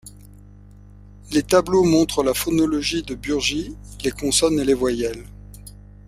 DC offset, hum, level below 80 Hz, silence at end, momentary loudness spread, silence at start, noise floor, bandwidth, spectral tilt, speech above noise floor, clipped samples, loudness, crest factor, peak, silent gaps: under 0.1%; 50 Hz at -40 dBFS; -42 dBFS; 0.35 s; 19 LU; 0.05 s; -44 dBFS; 16 kHz; -4 dB/octave; 24 dB; under 0.1%; -20 LUFS; 20 dB; -2 dBFS; none